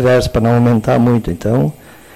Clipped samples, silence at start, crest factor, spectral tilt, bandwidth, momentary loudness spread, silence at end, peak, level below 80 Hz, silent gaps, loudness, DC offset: under 0.1%; 0 s; 8 dB; -7.5 dB/octave; 14 kHz; 4 LU; 0.45 s; -4 dBFS; -32 dBFS; none; -13 LUFS; under 0.1%